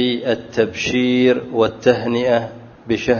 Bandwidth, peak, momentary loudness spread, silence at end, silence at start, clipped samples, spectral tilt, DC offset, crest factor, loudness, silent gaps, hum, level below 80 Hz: 7 kHz; 0 dBFS; 7 LU; 0 s; 0 s; under 0.1%; -5.5 dB/octave; under 0.1%; 18 dB; -18 LUFS; none; none; -50 dBFS